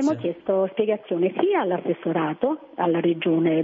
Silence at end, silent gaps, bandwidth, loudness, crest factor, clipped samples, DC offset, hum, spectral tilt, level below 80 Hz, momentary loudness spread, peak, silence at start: 0 s; none; 7.8 kHz; -23 LUFS; 14 dB; under 0.1%; under 0.1%; none; -7.5 dB/octave; -70 dBFS; 4 LU; -8 dBFS; 0 s